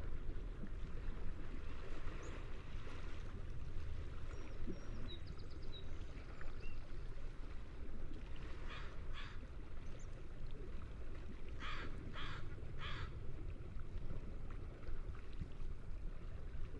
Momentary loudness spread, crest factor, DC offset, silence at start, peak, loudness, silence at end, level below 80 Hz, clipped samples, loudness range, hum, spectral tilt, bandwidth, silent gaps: 5 LU; 12 dB; under 0.1%; 0 s; -30 dBFS; -52 LUFS; 0 s; -46 dBFS; under 0.1%; 3 LU; none; -6 dB/octave; 7.2 kHz; none